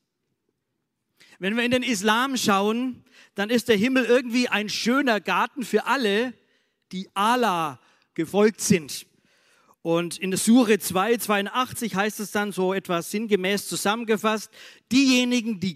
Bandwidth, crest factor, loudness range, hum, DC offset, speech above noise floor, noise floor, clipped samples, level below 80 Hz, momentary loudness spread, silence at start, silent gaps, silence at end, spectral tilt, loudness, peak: 16 kHz; 18 dB; 3 LU; none; under 0.1%; 55 dB; -78 dBFS; under 0.1%; -68 dBFS; 11 LU; 1.4 s; none; 0 s; -4 dB/octave; -23 LUFS; -6 dBFS